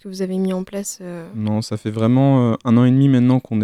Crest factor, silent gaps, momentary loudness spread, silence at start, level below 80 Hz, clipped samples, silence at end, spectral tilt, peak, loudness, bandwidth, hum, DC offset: 14 dB; none; 13 LU; 0.05 s; -60 dBFS; under 0.1%; 0 s; -7.5 dB/octave; -4 dBFS; -17 LUFS; 15 kHz; none; under 0.1%